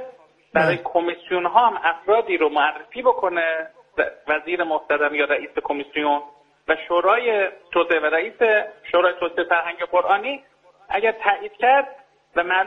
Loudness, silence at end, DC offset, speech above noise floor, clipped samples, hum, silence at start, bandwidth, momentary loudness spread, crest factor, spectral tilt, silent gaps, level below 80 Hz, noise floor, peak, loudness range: -21 LUFS; 0 s; under 0.1%; 24 dB; under 0.1%; none; 0 s; 5.6 kHz; 8 LU; 20 dB; -6 dB/octave; none; -62 dBFS; -45 dBFS; -2 dBFS; 2 LU